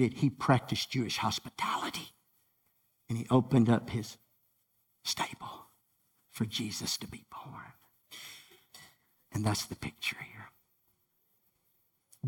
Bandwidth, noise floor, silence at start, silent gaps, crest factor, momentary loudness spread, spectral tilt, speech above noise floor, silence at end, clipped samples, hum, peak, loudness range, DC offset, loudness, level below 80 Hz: 18.5 kHz; -75 dBFS; 0 s; none; 22 dB; 23 LU; -5 dB/octave; 43 dB; 0 s; under 0.1%; none; -12 dBFS; 8 LU; under 0.1%; -32 LUFS; -64 dBFS